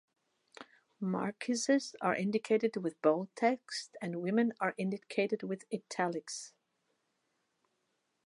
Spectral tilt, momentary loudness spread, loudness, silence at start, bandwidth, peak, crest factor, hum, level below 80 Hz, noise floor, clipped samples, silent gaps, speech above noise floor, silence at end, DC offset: -5 dB/octave; 10 LU; -34 LUFS; 0.6 s; 11.5 kHz; -14 dBFS; 22 dB; none; -86 dBFS; -81 dBFS; under 0.1%; none; 47 dB; 1.8 s; under 0.1%